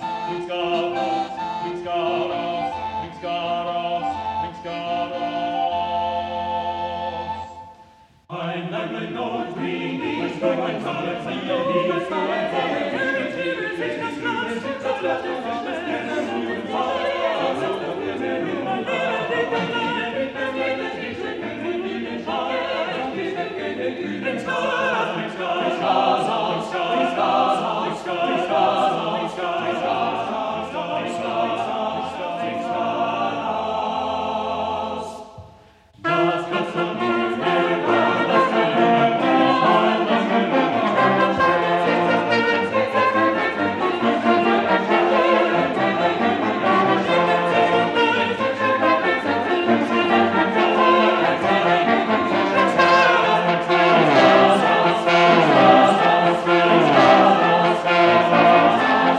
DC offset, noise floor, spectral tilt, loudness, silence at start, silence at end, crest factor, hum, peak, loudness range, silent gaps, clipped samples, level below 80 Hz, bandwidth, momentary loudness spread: under 0.1%; -50 dBFS; -5.5 dB/octave; -20 LUFS; 0 s; 0 s; 18 dB; none; -2 dBFS; 11 LU; none; under 0.1%; -58 dBFS; 10 kHz; 12 LU